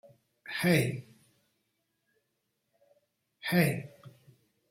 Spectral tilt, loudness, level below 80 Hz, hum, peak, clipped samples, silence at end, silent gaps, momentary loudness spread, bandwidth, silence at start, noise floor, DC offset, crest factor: -5.5 dB/octave; -30 LUFS; -70 dBFS; none; -12 dBFS; under 0.1%; 0.6 s; none; 19 LU; 16.5 kHz; 0.45 s; -81 dBFS; under 0.1%; 24 dB